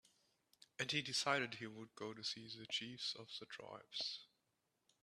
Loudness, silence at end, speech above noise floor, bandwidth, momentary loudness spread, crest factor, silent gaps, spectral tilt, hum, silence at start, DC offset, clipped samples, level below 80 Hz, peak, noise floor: -44 LUFS; 0.75 s; 40 dB; 13.5 kHz; 14 LU; 26 dB; none; -2.5 dB/octave; none; 0.8 s; under 0.1%; under 0.1%; -86 dBFS; -20 dBFS; -86 dBFS